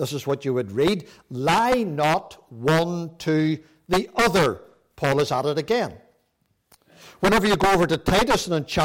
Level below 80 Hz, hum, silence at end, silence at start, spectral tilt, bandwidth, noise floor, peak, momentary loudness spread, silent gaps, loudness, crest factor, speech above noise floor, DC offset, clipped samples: -44 dBFS; none; 0 s; 0 s; -5 dB/octave; 17 kHz; -70 dBFS; -12 dBFS; 9 LU; none; -22 LUFS; 12 dB; 48 dB; under 0.1%; under 0.1%